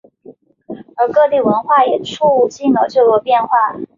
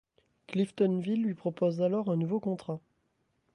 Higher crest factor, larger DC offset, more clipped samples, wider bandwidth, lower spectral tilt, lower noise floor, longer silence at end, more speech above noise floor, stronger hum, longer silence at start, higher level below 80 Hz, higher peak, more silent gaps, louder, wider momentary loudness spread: about the same, 12 dB vs 16 dB; neither; neither; second, 7.6 kHz vs 10.5 kHz; second, -5.5 dB/octave vs -8.5 dB/octave; second, -42 dBFS vs -76 dBFS; second, 0.1 s vs 0.75 s; second, 29 dB vs 46 dB; neither; second, 0.3 s vs 0.5 s; first, -60 dBFS vs -76 dBFS; first, -2 dBFS vs -16 dBFS; neither; first, -13 LUFS vs -31 LUFS; second, 6 LU vs 9 LU